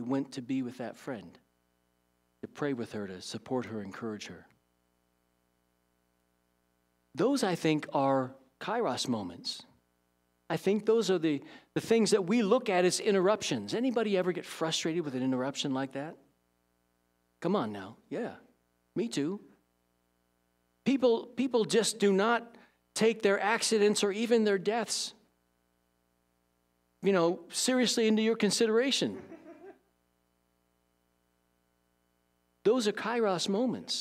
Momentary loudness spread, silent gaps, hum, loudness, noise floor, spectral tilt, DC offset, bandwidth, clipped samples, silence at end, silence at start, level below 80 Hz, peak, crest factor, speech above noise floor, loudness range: 14 LU; none; 60 Hz at -60 dBFS; -30 LUFS; -75 dBFS; -4 dB/octave; under 0.1%; 15.5 kHz; under 0.1%; 0 s; 0 s; -80 dBFS; -12 dBFS; 20 dB; 45 dB; 11 LU